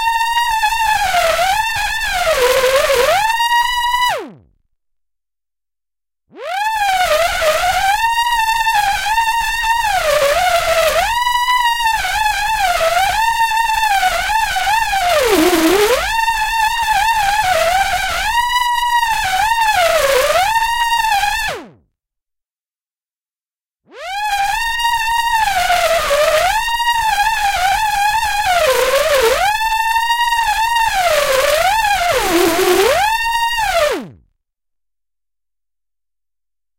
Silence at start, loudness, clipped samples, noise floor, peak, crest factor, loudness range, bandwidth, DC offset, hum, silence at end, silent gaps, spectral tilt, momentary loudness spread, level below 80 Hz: 0 s; -14 LUFS; under 0.1%; under -90 dBFS; 0 dBFS; 14 dB; 6 LU; 16.5 kHz; under 0.1%; none; 2.65 s; none; -1.5 dB/octave; 3 LU; -36 dBFS